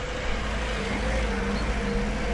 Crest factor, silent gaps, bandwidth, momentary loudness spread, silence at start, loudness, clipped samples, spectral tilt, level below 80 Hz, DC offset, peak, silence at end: 12 dB; none; 11.5 kHz; 2 LU; 0 s; -28 LUFS; under 0.1%; -5 dB/octave; -30 dBFS; under 0.1%; -14 dBFS; 0 s